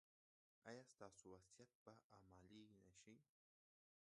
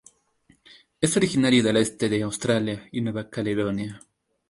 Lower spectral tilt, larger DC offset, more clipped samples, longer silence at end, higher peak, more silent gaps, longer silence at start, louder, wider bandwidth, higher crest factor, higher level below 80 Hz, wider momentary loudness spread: about the same, -4.5 dB/octave vs -5 dB/octave; neither; neither; first, 0.8 s vs 0.5 s; second, -44 dBFS vs -6 dBFS; first, 1.75-1.86 s, 2.04-2.10 s vs none; second, 0.65 s vs 1 s; second, -66 LUFS vs -24 LUFS; about the same, 11 kHz vs 11.5 kHz; about the same, 24 dB vs 20 dB; second, -88 dBFS vs -56 dBFS; second, 7 LU vs 10 LU